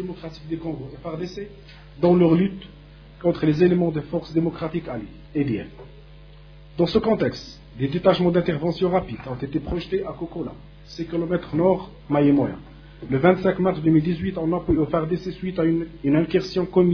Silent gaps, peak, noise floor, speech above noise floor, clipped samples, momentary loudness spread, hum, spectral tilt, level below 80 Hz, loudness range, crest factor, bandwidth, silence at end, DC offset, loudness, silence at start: none; -4 dBFS; -45 dBFS; 23 dB; under 0.1%; 15 LU; none; -8.5 dB/octave; -44 dBFS; 5 LU; 20 dB; 5.4 kHz; 0 s; under 0.1%; -23 LUFS; 0 s